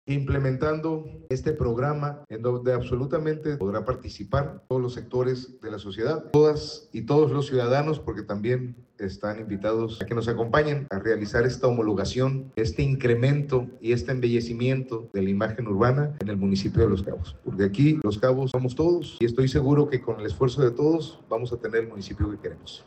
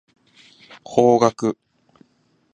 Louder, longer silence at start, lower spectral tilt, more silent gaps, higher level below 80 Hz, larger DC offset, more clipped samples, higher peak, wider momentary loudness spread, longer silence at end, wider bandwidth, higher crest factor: second, -25 LUFS vs -18 LUFS; second, 0.05 s vs 0.9 s; first, -7.5 dB/octave vs -6 dB/octave; neither; first, -46 dBFS vs -64 dBFS; neither; neither; second, -8 dBFS vs 0 dBFS; about the same, 10 LU vs 12 LU; second, 0.1 s vs 1 s; second, 8.6 kHz vs 9.8 kHz; second, 16 dB vs 22 dB